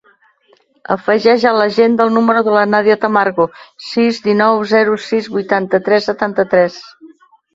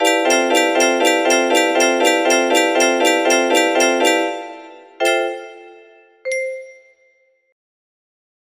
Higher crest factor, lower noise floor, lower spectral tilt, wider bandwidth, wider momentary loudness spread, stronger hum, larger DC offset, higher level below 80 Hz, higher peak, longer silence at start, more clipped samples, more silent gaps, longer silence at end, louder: about the same, 14 dB vs 16 dB; second, -54 dBFS vs -59 dBFS; first, -6 dB/octave vs 0 dB/octave; second, 7.8 kHz vs 15.5 kHz; second, 7 LU vs 12 LU; neither; neither; first, -58 dBFS vs -70 dBFS; about the same, 0 dBFS vs -2 dBFS; first, 0.9 s vs 0 s; neither; neither; second, 0.45 s vs 1.8 s; about the same, -13 LUFS vs -15 LUFS